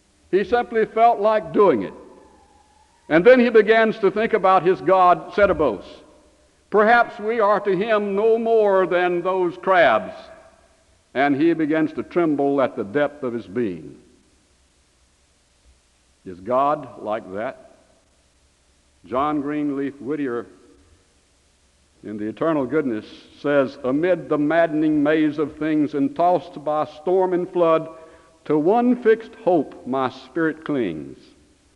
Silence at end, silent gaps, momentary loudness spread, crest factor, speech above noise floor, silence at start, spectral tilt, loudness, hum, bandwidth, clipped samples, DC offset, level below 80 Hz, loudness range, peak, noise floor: 0.65 s; none; 13 LU; 18 dB; 41 dB; 0.3 s; -7.5 dB/octave; -20 LUFS; none; 10 kHz; under 0.1%; under 0.1%; -56 dBFS; 10 LU; -2 dBFS; -60 dBFS